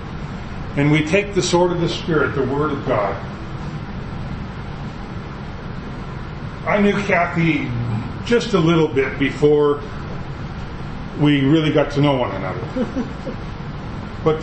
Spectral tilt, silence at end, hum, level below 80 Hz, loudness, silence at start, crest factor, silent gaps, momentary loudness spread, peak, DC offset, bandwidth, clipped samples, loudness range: -6.5 dB/octave; 0 s; none; -36 dBFS; -20 LUFS; 0 s; 18 dB; none; 15 LU; -2 dBFS; under 0.1%; 8.6 kHz; under 0.1%; 8 LU